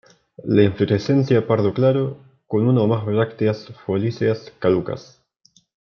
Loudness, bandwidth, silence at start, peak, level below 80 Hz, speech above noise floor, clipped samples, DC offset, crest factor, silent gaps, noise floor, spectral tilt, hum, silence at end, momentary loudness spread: -20 LUFS; 6.8 kHz; 0.45 s; -4 dBFS; -60 dBFS; 40 dB; under 0.1%; under 0.1%; 16 dB; none; -59 dBFS; -8.5 dB/octave; none; 0.95 s; 9 LU